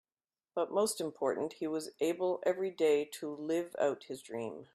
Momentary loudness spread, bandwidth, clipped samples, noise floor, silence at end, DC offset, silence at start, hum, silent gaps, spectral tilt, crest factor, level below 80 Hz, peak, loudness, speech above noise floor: 11 LU; 15 kHz; under 0.1%; under -90 dBFS; 0.1 s; under 0.1%; 0.55 s; none; none; -4 dB/octave; 16 dB; -82 dBFS; -18 dBFS; -35 LUFS; over 56 dB